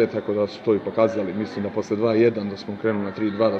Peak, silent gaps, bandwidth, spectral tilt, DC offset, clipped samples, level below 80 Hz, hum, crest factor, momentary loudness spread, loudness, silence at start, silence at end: -4 dBFS; none; 7.6 kHz; -7.5 dB/octave; under 0.1%; under 0.1%; -66 dBFS; none; 18 dB; 8 LU; -23 LUFS; 0 s; 0 s